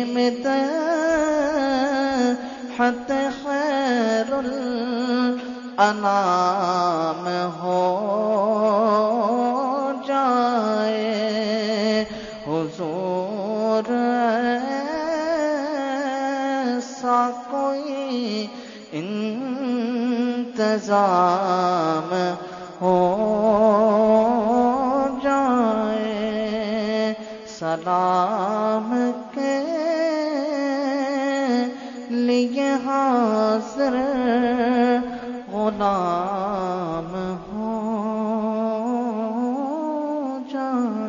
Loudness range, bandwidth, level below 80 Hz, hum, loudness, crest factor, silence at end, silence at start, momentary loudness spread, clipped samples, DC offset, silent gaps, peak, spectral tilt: 5 LU; 7.4 kHz; -58 dBFS; none; -22 LUFS; 18 dB; 0 s; 0 s; 8 LU; under 0.1%; under 0.1%; none; -4 dBFS; -5.5 dB/octave